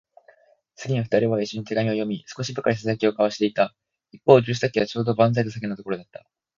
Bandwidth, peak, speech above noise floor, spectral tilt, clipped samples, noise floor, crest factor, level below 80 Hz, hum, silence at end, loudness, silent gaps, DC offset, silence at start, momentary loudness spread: 7.6 kHz; 0 dBFS; 35 dB; -6.5 dB/octave; under 0.1%; -57 dBFS; 22 dB; -62 dBFS; none; 0.55 s; -23 LUFS; none; under 0.1%; 0.8 s; 13 LU